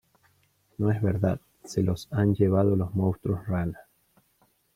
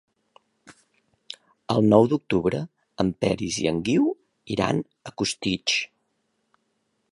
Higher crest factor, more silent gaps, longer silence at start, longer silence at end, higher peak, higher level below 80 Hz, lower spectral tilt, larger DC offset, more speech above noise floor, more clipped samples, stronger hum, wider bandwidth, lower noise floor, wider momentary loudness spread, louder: about the same, 18 dB vs 22 dB; neither; about the same, 0.8 s vs 0.7 s; second, 0.95 s vs 1.25 s; second, -10 dBFS vs -4 dBFS; about the same, -54 dBFS vs -54 dBFS; first, -8.5 dB/octave vs -5 dB/octave; neither; second, 42 dB vs 50 dB; neither; neither; first, 14 kHz vs 11.5 kHz; second, -67 dBFS vs -73 dBFS; second, 12 LU vs 20 LU; second, -27 LUFS vs -24 LUFS